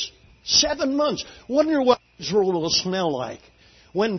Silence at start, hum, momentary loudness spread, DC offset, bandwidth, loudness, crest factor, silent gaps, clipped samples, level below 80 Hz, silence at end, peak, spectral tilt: 0 s; none; 14 LU; under 0.1%; 6.4 kHz; -22 LUFS; 20 dB; none; under 0.1%; -54 dBFS; 0 s; -4 dBFS; -3 dB/octave